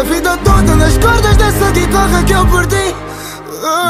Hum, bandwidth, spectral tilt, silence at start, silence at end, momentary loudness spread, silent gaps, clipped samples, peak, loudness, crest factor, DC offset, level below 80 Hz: none; 16 kHz; -5 dB/octave; 0 s; 0 s; 13 LU; none; under 0.1%; 0 dBFS; -11 LUFS; 10 dB; under 0.1%; -16 dBFS